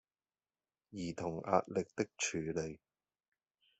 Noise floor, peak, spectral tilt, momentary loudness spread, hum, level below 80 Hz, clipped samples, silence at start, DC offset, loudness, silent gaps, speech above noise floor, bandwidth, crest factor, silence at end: under -90 dBFS; -16 dBFS; -4.5 dB/octave; 12 LU; none; -72 dBFS; under 0.1%; 0.9 s; under 0.1%; -38 LUFS; none; over 52 dB; 8.2 kHz; 26 dB; 1.05 s